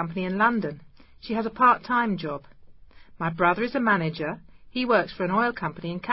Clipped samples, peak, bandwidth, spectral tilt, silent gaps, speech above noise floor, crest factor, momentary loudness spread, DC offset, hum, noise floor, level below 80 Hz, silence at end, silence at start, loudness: under 0.1%; -6 dBFS; 5.8 kHz; -10.5 dB/octave; none; 23 dB; 20 dB; 14 LU; under 0.1%; none; -47 dBFS; -58 dBFS; 0 s; 0 s; -25 LUFS